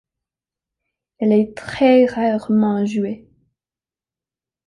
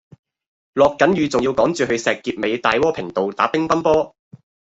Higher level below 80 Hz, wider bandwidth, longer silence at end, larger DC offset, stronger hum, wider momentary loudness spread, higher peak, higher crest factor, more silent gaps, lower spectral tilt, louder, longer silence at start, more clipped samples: second, -58 dBFS vs -52 dBFS; first, 10.5 kHz vs 8.2 kHz; first, 1.5 s vs 0.6 s; neither; neither; first, 11 LU vs 7 LU; about the same, -4 dBFS vs -2 dBFS; about the same, 16 dB vs 18 dB; neither; first, -7.5 dB/octave vs -5 dB/octave; about the same, -17 LUFS vs -18 LUFS; first, 1.2 s vs 0.75 s; neither